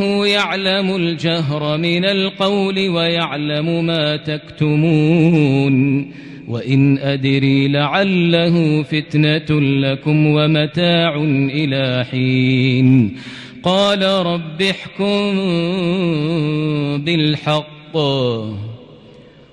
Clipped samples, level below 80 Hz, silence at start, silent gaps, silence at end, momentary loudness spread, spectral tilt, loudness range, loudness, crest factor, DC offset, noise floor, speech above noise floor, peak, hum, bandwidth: under 0.1%; -52 dBFS; 0 s; none; 0.55 s; 7 LU; -7 dB/octave; 3 LU; -16 LUFS; 14 dB; under 0.1%; -42 dBFS; 27 dB; -2 dBFS; none; 10.5 kHz